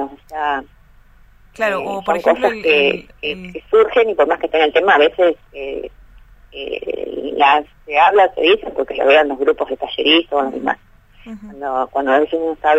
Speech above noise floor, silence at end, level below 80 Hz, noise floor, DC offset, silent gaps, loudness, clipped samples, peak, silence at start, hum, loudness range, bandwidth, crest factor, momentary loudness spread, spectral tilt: 31 dB; 0 s; -48 dBFS; -47 dBFS; under 0.1%; none; -16 LUFS; under 0.1%; 0 dBFS; 0 s; none; 4 LU; 8.2 kHz; 16 dB; 15 LU; -4.5 dB/octave